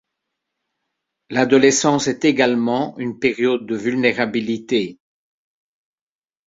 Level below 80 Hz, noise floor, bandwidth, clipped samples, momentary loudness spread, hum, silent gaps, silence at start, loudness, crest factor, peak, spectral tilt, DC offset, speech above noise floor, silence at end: -62 dBFS; -79 dBFS; 7.8 kHz; under 0.1%; 9 LU; none; none; 1.3 s; -18 LUFS; 18 dB; -2 dBFS; -4 dB/octave; under 0.1%; 61 dB; 1.55 s